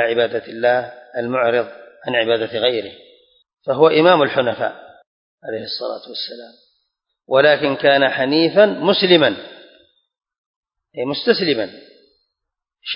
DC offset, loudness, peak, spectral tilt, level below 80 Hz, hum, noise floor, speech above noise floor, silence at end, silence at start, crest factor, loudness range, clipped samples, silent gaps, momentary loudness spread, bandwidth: under 0.1%; -17 LUFS; 0 dBFS; -9.5 dB/octave; -64 dBFS; none; -82 dBFS; 65 dB; 0 s; 0 s; 18 dB; 7 LU; under 0.1%; 5.07-5.38 s, 10.38-10.63 s; 18 LU; 5.4 kHz